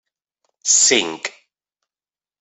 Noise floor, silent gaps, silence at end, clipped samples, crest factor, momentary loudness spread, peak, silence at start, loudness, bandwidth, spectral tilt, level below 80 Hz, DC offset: under -90 dBFS; none; 1.1 s; under 0.1%; 22 dB; 17 LU; 0 dBFS; 0.65 s; -15 LUFS; 8.6 kHz; 0.5 dB/octave; -70 dBFS; under 0.1%